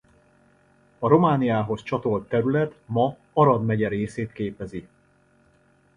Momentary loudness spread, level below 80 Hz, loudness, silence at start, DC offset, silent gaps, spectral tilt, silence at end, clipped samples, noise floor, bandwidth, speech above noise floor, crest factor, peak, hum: 12 LU; -56 dBFS; -23 LUFS; 1 s; under 0.1%; none; -8.5 dB/octave; 1.15 s; under 0.1%; -61 dBFS; 10.5 kHz; 38 dB; 22 dB; -2 dBFS; none